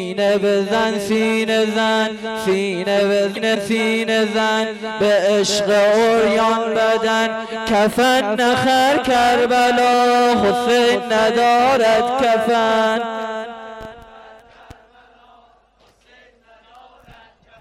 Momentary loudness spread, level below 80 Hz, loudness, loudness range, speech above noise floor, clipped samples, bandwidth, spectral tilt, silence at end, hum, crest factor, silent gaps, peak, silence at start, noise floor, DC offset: 7 LU; -52 dBFS; -16 LUFS; 6 LU; 39 dB; under 0.1%; 16 kHz; -4 dB/octave; 3.35 s; none; 8 dB; none; -8 dBFS; 0 s; -55 dBFS; under 0.1%